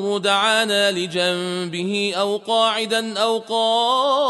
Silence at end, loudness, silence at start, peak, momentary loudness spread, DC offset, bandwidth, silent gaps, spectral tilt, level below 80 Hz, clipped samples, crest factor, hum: 0 s; -19 LUFS; 0 s; -4 dBFS; 6 LU; under 0.1%; 12 kHz; none; -3 dB/octave; -72 dBFS; under 0.1%; 16 dB; none